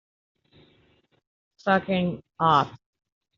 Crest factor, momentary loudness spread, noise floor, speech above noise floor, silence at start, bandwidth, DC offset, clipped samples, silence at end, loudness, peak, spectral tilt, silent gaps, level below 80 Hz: 22 dB; 11 LU; -63 dBFS; 40 dB; 1.65 s; 7.2 kHz; under 0.1%; under 0.1%; 0.6 s; -24 LUFS; -6 dBFS; -4 dB/octave; none; -62 dBFS